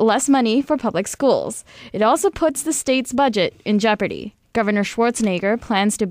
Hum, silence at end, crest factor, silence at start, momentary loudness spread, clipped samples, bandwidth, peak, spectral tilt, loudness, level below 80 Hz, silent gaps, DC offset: none; 0 s; 14 dB; 0 s; 7 LU; under 0.1%; 16 kHz; -6 dBFS; -4 dB/octave; -19 LUFS; -52 dBFS; none; under 0.1%